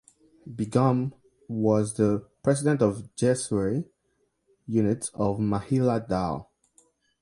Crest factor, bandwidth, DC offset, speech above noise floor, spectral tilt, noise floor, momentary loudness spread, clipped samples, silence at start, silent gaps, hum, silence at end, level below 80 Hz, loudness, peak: 18 dB; 11.5 kHz; under 0.1%; 48 dB; -7 dB/octave; -73 dBFS; 10 LU; under 0.1%; 0.45 s; none; none; 0.8 s; -54 dBFS; -26 LUFS; -8 dBFS